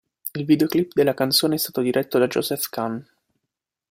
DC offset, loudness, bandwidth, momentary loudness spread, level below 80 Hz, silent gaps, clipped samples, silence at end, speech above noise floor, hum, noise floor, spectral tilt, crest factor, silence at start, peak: under 0.1%; -21 LUFS; 16 kHz; 11 LU; -64 dBFS; none; under 0.1%; 0.9 s; 62 dB; none; -83 dBFS; -4.5 dB/octave; 18 dB; 0.25 s; -6 dBFS